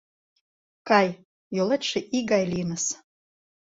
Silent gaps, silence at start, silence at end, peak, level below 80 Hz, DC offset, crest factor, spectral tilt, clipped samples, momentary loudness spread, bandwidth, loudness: 1.25-1.51 s; 0.85 s; 0.75 s; -6 dBFS; -62 dBFS; under 0.1%; 20 dB; -4 dB/octave; under 0.1%; 14 LU; 8 kHz; -25 LUFS